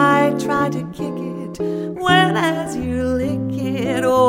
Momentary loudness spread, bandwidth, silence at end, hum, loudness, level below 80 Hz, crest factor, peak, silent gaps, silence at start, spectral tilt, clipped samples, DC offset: 11 LU; 16 kHz; 0 s; none; -19 LUFS; -44 dBFS; 16 dB; -2 dBFS; none; 0 s; -5.5 dB/octave; under 0.1%; under 0.1%